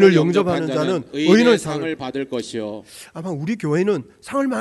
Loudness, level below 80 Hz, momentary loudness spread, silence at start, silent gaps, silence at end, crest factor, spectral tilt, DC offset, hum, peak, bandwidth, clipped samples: -20 LUFS; -60 dBFS; 15 LU; 0 s; none; 0 s; 18 dB; -6 dB/octave; under 0.1%; none; 0 dBFS; 12 kHz; under 0.1%